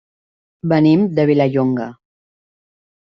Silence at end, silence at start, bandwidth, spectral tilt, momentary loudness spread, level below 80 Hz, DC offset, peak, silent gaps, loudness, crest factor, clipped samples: 1.1 s; 0.65 s; 6 kHz; -9.5 dB/octave; 13 LU; -58 dBFS; under 0.1%; -2 dBFS; none; -15 LUFS; 16 dB; under 0.1%